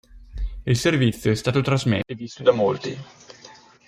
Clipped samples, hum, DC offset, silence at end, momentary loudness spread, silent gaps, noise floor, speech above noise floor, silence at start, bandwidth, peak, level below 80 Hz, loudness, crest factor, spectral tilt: under 0.1%; none; under 0.1%; 0.35 s; 16 LU; none; -48 dBFS; 27 dB; 0.15 s; 15.5 kHz; -4 dBFS; -40 dBFS; -22 LUFS; 20 dB; -6 dB/octave